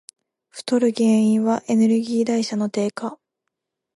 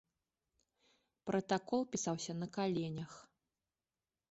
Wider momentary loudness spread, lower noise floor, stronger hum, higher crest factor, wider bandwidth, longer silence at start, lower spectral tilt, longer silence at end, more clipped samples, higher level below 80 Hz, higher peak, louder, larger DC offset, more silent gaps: about the same, 14 LU vs 13 LU; second, -80 dBFS vs under -90 dBFS; neither; second, 14 dB vs 20 dB; first, 11.5 kHz vs 8 kHz; second, 0.55 s vs 1.25 s; about the same, -6 dB/octave vs -5.5 dB/octave; second, 0.85 s vs 1.05 s; neither; about the same, -72 dBFS vs -76 dBFS; first, -8 dBFS vs -22 dBFS; first, -20 LUFS vs -39 LUFS; neither; neither